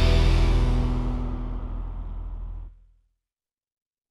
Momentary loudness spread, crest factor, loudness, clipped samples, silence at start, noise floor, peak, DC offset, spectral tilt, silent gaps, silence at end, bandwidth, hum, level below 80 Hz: 18 LU; 16 dB; -27 LUFS; under 0.1%; 0 s; under -90 dBFS; -10 dBFS; under 0.1%; -6.5 dB/octave; none; 1.35 s; 10 kHz; none; -26 dBFS